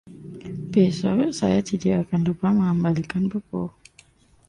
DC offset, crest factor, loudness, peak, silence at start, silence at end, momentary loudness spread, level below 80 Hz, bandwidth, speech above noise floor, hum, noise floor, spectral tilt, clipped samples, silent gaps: under 0.1%; 16 dB; -23 LUFS; -6 dBFS; 0.05 s; 0.8 s; 14 LU; -52 dBFS; 10.5 kHz; 34 dB; none; -55 dBFS; -7.5 dB/octave; under 0.1%; none